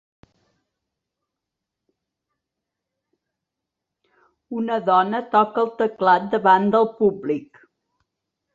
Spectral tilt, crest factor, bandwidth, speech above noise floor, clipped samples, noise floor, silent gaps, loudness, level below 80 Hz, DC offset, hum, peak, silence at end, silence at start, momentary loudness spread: -7.5 dB/octave; 20 dB; 7.4 kHz; 65 dB; under 0.1%; -84 dBFS; none; -20 LUFS; -68 dBFS; under 0.1%; none; -4 dBFS; 1.1 s; 4.5 s; 11 LU